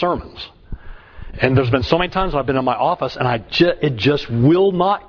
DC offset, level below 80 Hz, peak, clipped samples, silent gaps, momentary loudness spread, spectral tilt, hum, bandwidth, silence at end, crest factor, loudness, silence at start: under 0.1%; -36 dBFS; 0 dBFS; under 0.1%; none; 19 LU; -7.5 dB/octave; none; 5.4 kHz; 0.05 s; 18 dB; -17 LUFS; 0 s